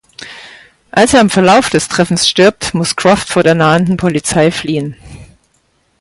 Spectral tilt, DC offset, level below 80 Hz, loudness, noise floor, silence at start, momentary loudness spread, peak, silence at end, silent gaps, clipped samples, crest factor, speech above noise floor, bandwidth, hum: -4.5 dB/octave; under 0.1%; -42 dBFS; -11 LUFS; -57 dBFS; 0.2 s; 13 LU; 0 dBFS; 0.8 s; none; under 0.1%; 12 dB; 47 dB; 11.5 kHz; none